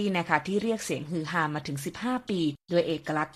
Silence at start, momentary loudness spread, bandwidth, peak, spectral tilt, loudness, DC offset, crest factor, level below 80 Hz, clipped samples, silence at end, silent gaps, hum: 0 s; 6 LU; 14.5 kHz; -6 dBFS; -5 dB/octave; -29 LUFS; under 0.1%; 22 dB; -64 dBFS; under 0.1%; 0.05 s; none; none